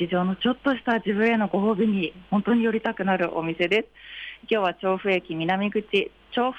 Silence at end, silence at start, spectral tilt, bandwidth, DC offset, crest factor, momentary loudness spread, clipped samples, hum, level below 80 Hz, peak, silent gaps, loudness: 0 s; 0 s; -7.5 dB/octave; 8 kHz; under 0.1%; 12 dB; 5 LU; under 0.1%; none; -60 dBFS; -12 dBFS; none; -24 LUFS